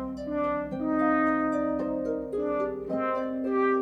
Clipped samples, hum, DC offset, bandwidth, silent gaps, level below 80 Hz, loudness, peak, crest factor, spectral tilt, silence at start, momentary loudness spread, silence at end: under 0.1%; none; under 0.1%; 7.6 kHz; none; -54 dBFS; -28 LUFS; -14 dBFS; 14 dB; -8 dB/octave; 0 s; 6 LU; 0 s